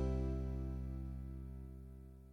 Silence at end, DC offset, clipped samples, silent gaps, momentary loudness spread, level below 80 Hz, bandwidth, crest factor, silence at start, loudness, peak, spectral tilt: 0 s; under 0.1%; under 0.1%; none; 14 LU; -44 dBFS; 6.2 kHz; 14 dB; 0 s; -45 LUFS; -28 dBFS; -9.5 dB/octave